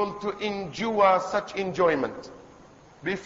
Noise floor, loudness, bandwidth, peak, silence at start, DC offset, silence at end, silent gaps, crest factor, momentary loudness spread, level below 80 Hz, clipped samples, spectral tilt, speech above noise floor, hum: -52 dBFS; -26 LUFS; 7.8 kHz; -8 dBFS; 0 s; under 0.1%; 0 s; none; 18 dB; 14 LU; -60 dBFS; under 0.1%; -5 dB/octave; 26 dB; none